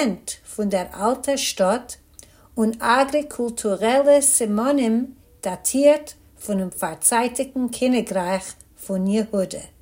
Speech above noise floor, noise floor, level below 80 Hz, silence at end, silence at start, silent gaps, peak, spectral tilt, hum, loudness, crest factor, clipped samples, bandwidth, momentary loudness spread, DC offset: 28 dB; -49 dBFS; -54 dBFS; 0.15 s; 0 s; none; -2 dBFS; -3.5 dB/octave; none; -21 LUFS; 18 dB; under 0.1%; 16.5 kHz; 15 LU; under 0.1%